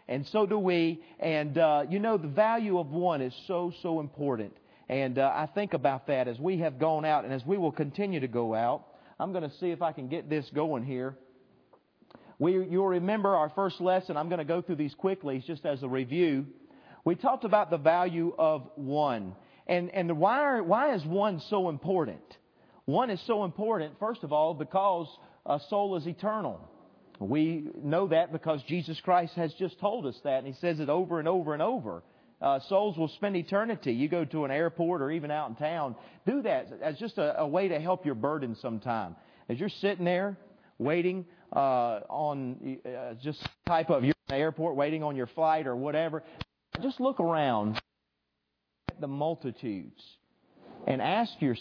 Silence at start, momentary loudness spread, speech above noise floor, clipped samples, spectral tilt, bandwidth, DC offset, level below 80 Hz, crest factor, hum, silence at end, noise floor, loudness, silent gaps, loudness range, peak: 0.1 s; 10 LU; 52 dB; under 0.1%; -8.5 dB/octave; 5.4 kHz; under 0.1%; -68 dBFS; 20 dB; none; 0 s; -82 dBFS; -30 LUFS; none; 4 LU; -10 dBFS